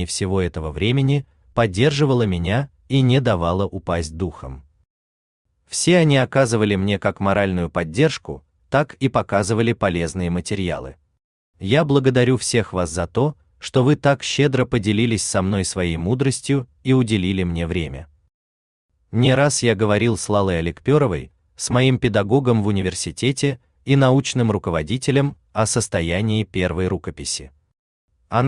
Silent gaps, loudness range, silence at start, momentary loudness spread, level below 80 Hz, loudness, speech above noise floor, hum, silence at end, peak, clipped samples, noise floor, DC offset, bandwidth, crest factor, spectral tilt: 4.90-5.45 s, 11.24-11.54 s, 18.34-18.89 s, 27.79-28.08 s; 3 LU; 0 s; 9 LU; -44 dBFS; -20 LUFS; over 71 dB; none; 0 s; -4 dBFS; under 0.1%; under -90 dBFS; under 0.1%; 12 kHz; 16 dB; -5.5 dB/octave